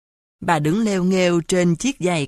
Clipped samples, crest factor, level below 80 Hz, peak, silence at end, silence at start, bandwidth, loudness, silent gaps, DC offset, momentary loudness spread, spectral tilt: under 0.1%; 16 dB; -50 dBFS; -4 dBFS; 0 s; 0.4 s; 13 kHz; -19 LUFS; none; under 0.1%; 3 LU; -5.5 dB/octave